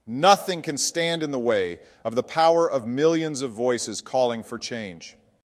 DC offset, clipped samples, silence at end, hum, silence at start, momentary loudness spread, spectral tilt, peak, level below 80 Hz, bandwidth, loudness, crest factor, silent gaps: under 0.1%; under 0.1%; 0.35 s; none; 0.05 s; 13 LU; -3.5 dB/octave; -4 dBFS; -68 dBFS; 15.5 kHz; -24 LUFS; 20 dB; none